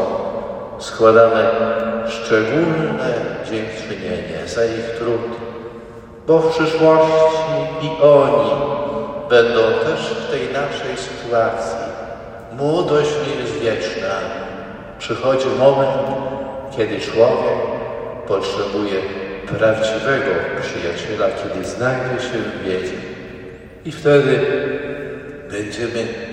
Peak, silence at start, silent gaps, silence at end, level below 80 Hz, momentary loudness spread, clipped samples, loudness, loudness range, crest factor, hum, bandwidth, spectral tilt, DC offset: 0 dBFS; 0 s; none; 0 s; -48 dBFS; 15 LU; under 0.1%; -18 LUFS; 6 LU; 18 dB; none; 9.8 kHz; -5.5 dB/octave; under 0.1%